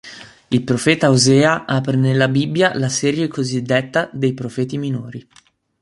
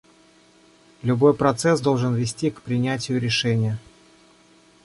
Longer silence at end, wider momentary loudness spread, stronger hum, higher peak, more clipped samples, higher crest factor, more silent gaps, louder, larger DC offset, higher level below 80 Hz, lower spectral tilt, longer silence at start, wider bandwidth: second, 0.6 s vs 1.05 s; about the same, 11 LU vs 9 LU; neither; first, 0 dBFS vs -4 dBFS; neither; about the same, 18 dB vs 20 dB; neither; first, -17 LUFS vs -22 LUFS; neither; about the same, -56 dBFS vs -56 dBFS; about the same, -5 dB/octave vs -5.5 dB/octave; second, 0.05 s vs 1.05 s; about the same, 11.5 kHz vs 11.5 kHz